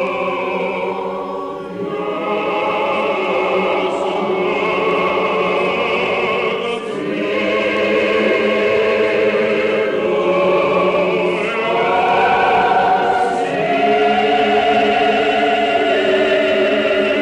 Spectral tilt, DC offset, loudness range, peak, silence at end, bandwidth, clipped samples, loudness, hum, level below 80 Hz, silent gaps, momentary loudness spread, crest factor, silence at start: -5.5 dB/octave; under 0.1%; 4 LU; -4 dBFS; 0 s; 10.5 kHz; under 0.1%; -16 LUFS; none; -50 dBFS; none; 7 LU; 12 dB; 0 s